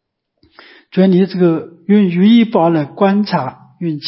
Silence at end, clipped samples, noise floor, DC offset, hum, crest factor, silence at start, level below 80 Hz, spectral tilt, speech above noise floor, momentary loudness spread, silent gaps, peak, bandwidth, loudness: 0 s; under 0.1%; -57 dBFS; under 0.1%; none; 12 dB; 0.95 s; -64 dBFS; -12 dB/octave; 45 dB; 12 LU; none; -2 dBFS; 5.8 kHz; -13 LUFS